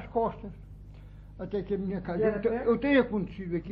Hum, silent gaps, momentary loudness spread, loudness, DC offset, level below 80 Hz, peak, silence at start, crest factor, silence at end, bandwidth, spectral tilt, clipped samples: 50 Hz at -45 dBFS; none; 24 LU; -29 LUFS; under 0.1%; -48 dBFS; -12 dBFS; 0 s; 18 dB; 0 s; 5.2 kHz; -10 dB/octave; under 0.1%